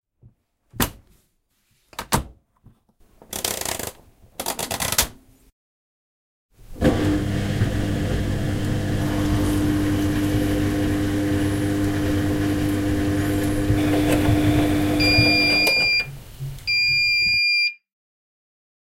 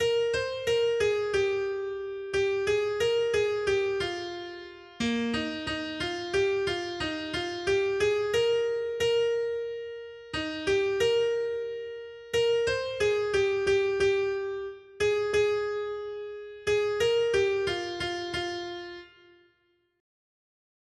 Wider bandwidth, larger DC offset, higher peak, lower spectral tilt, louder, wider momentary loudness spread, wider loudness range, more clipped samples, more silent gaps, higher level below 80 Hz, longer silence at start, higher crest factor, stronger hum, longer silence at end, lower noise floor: first, 17 kHz vs 12.5 kHz; neither; first, -2 dBFS vs -14 dBFS; about the same, -4.5 dB/octave vs -4 dB/octave; first, -21 LUFS vs -28 LUFS; about the same, 11 LU vs 12 LU; first, 11 LU vs 3 LU; neither; first, 5.52-6.49 s vs none; first, -34 dBFS vs -56 dBFS; first, 0.75 s vs 0 s; first, 20 dB vs 14 dB; neither; second, 1.2 s vs 1.9 s; second, -67 dBFS vs -71 dBFS